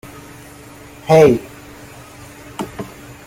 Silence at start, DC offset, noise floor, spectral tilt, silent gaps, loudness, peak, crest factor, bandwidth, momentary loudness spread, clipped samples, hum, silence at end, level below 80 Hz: 1.05 s; under 0.1%; -39 dBFS; -6.5 dB/octave; none; -14 LUFS; -2 dBFS; 18 dB; 16.5 kHz; 27 LU; under 0.1%; none; 0.4 s; -48 dBFS